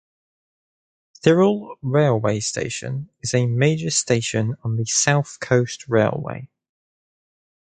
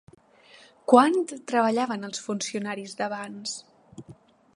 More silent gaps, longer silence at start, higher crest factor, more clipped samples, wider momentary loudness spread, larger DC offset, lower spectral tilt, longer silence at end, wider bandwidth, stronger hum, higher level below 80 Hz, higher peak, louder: neither; first, 1.25 s vs 0.9 s; about the same, 22 dB vs 24 dB; neither; second, 10 LU vs 16 LU; neither; about the same, -4.5 dB/octave vs -4 dB/octave; first, 1.15 s vs 0.45 s; second, 9.4 kHz vs 11.5 kHz; neither; first, -56 dBFS vs -76 dBFS; about the same, 0 dBFS vs -2 dBFS; first, -20 LUFS vs -25 LUFS